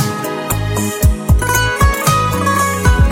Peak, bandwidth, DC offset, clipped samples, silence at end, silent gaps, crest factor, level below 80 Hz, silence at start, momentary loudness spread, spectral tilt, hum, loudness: 0 dBFS; 17 kHz; under 0.1%; under 0.1%; 0 s; none; 12 dB; -18 dBFS; 0 s; 6 LU; -4.5 dB/octave; none; -14 LUFS